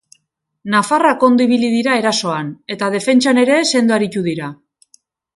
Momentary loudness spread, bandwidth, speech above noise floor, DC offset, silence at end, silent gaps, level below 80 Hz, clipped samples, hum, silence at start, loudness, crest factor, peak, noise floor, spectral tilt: 11 LU; 11.5 kHz; 51 dB; under 0.1%; 0.8 s; none; -64 dBFS; under 0.1%; none; 0.65 s; -15 LUFS; 16 dB; 0 dBFS; -66 dBFS; -4 dB/octave